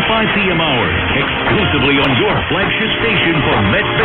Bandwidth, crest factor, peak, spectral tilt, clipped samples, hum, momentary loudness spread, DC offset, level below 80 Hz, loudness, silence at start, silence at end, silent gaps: 5 kHz; 12 dB; -2 dBFS; -8.5 dB/octave; under 0.1%; none; 3 LU; under 0.1%; -32 dBFS; -13 LUFS; 0 s; 0 s; none